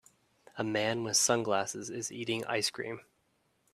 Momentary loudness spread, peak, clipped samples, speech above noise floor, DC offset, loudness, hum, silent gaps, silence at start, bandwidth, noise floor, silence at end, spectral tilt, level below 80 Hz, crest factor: 14 LU; -12 dBFS; under 0.1%; 42 dB; under 0.1%; -32 LUFS; none; none; 0.55 s; 15.5 kHz; -74 dBFS; 0.75 s; -2.5 dB/octave; -76 dBFS; 22 dB